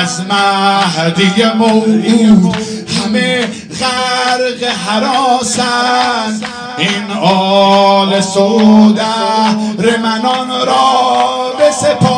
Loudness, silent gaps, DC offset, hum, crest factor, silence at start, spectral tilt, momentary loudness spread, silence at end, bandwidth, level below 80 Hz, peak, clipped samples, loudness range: -11 LUFS; none; under 0.1%; none; 10 dB; 0 s; -4.5 dB/octave; 8 LU; 0 s; 10 kHz; -48 dBFS; 0 dBFS; 0.5%; 3 LU